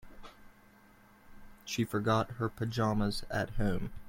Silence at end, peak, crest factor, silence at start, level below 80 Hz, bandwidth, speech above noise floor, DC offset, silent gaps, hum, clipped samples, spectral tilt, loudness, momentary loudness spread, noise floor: 0 s; -16 dBFS; 18 dB; 0.05 s; -46 dBFS; 16.5 kHz; 28 dB; under 0.1%; none; none; under 0.1%; -6 dB/octave; -33 LUFS; 21 LU; -60 dBFS